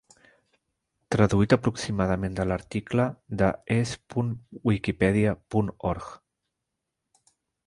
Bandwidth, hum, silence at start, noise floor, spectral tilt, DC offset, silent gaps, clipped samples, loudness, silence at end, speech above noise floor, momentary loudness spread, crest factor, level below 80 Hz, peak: 11.5 kHz; none; 1.1 s; -83 dBFS; -7 dB/octave; under 0.1%; none; under 0.1%; -26 LUFS; 1.5 s; 58 dB; 8 LU; 22 dB; -46 dBFS; -6 dBFS